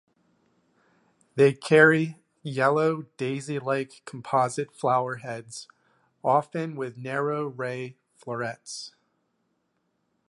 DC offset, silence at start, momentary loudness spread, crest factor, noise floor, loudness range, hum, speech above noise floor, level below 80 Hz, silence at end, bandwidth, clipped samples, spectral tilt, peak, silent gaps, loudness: under 0.1%; 1.35 s; 19 LU; 24 dB; -75 dBFS; 9 LU; none; 49 dB; -76 dBFS; 1.4 s; 11.5 kHz; under 0.1%; -5.5 dB/octave; -4 dBFS; none; -25 LUFS